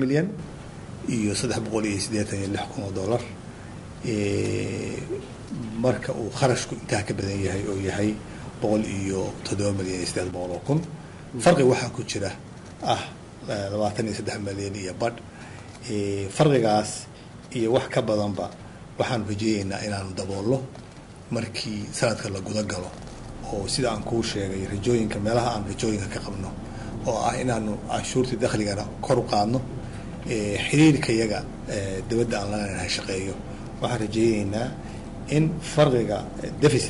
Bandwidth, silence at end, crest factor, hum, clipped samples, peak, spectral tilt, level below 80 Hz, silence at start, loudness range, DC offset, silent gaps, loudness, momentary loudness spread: 11.5 kHz; 0 s; 20 dB; none; under 0.1%; -6 dBFS; -5.5 dB/octave; -46 dBFS; 0 s; 5 LU; under 0.1%; none; -26 LUFS; 15 LU